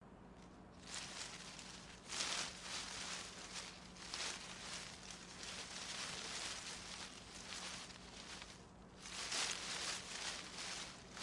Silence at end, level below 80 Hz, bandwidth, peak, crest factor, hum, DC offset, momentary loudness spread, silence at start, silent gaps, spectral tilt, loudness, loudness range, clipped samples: 0 s; -68 dBFS; 11.5 kHz; -22 dBFS; 28 dB; none; under 0.1%; 12 LU; 0 s; none; -1 dB/octave; -46 LUFS; 3 LU; under 0.1%